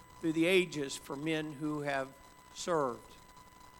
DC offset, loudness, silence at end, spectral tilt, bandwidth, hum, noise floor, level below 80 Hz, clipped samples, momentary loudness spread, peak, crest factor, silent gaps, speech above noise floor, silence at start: under 0.1%; -34 LUFS; 0 s; -4.5 dB/octave; 18 kHz; none; -56 dBFS; -66 dBFS; under 0.1%; 14 LU; -14 dBFS; 20 dB; none; 22 dB; 0 s